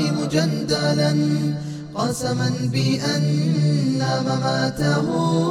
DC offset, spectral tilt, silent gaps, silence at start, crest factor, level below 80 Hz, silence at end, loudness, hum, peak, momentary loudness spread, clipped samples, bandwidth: under 0.1%; -6 dB/octave; none; 0 s; 14 dB; -52 dBFS; 0 s; -21 LUFS; none; -6 dBFS; 4 LU; under 0.1%; 13.5 kHz